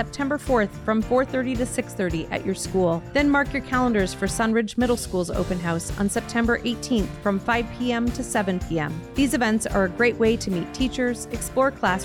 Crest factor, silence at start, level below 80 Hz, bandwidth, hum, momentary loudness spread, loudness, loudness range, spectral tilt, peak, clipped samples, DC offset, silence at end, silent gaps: 16 dB; 0 s; -38 dBFS; 17.5 kHz; none; 6 LU; -24 LUFS; 2 LU; -5 dB/octave; -8 dBFS; under 0.1%; under 0.1%; 0 s; none